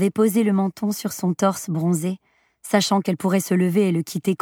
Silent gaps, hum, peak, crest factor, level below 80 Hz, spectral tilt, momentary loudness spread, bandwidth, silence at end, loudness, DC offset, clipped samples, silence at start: none; none; -2 dBFS; 18 dB; -70 dBFS; -5.5 dB/octave; 6 LU; 17.5 kHz; 0.05 s; -21 LUFS; under 0.1%; under 0.1%; 0 s